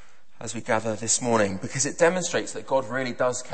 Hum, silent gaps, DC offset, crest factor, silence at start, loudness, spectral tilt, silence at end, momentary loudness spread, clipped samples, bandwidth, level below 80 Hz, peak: none; none; 1%; 18 dB; 0.4 s; -25 LUFS; -3.5 dB/octave; 0 s; 8 LU; under 0.1%; 8.8 kHz; -62 dBFS; -6 dBFS